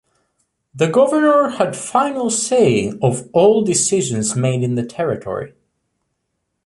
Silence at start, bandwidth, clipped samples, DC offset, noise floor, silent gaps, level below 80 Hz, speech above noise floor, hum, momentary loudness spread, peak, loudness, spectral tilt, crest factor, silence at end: 0.75 s; 11.5 kHz; under 0.1%; under 0.1%; -73 dBFS; none; -56 dBFS; 57 dB; none; 8 LU; -2 dBFS; -16 LUFS; -5 dB/octave; 14 dB; 1.2 s